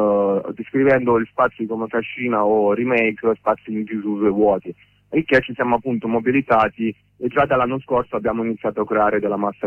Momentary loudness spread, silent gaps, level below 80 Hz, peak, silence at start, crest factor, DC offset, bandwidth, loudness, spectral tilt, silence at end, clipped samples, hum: 8 LU; none; -52 dBFS; -4 dBFS; 0 s; 16 dB; under 0.1%; 6 kHz; -20 LUFS; -8.5 dB/octave; 0 s; under 0.1%; none